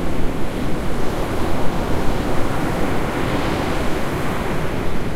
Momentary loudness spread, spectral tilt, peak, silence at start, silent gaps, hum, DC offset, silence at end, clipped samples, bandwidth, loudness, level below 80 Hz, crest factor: 3 LU; -6 dB/octave; -4 dBFS; 0 s; none; none; under 0.1%; 0 s; under 0.1%; 15 kHz; -23 LUFS; -26 dBFS; 12 dB